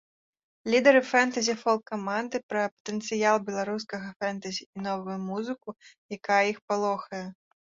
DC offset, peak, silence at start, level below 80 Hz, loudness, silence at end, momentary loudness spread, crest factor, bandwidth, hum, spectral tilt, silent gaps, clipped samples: under 0.1%; -6 dBFS; 0.65 s; -74 dBFS; -27 LUFS; 0.4 s; 16 LU; 22 dB; 7.8 kHz; none; -4 dB/octave; 2.43-2.49 s, 2.72-2.85 s, 4.16-4.20 s, 4.66-4.73 s, 5.98-6.09 s, 6.62-6.68 s; under 0.1%